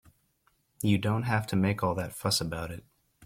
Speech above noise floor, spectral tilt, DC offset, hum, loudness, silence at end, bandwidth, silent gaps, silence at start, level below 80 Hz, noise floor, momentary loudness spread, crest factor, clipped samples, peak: 42 dB; -5 dB/octave; under 0.1%; none; -29 LUFS; 0 s; 16.5 kHz; none; 0.8 s; -56 dBFS; -71 dBFS; 10 LU; 18 dB; under 0.1%; -12 dBFS